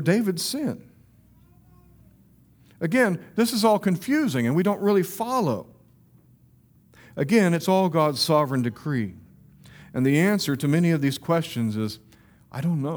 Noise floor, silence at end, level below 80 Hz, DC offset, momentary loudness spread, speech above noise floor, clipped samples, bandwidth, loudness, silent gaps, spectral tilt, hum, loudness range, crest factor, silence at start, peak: -57 dBFS; 0 s; -62 dBFS; under 0.1%; 11 LU; 34 dB; under 0.1%; over 20 kHz; -23 LUFS; none; -6 dB/octave; none; 3 LU; 18 dB; 0 s; -6 dBFS